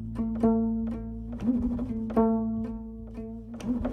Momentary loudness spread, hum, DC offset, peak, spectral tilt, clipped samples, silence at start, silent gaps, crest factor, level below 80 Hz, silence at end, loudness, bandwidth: 14 LU; none; under 0.1%; -12 dBFS; -9.5 dB/octave; under 0.1%; 0 s; none; 16 dB; -42 dBFS; 0 s; -29 LUFS; 6.2 kHz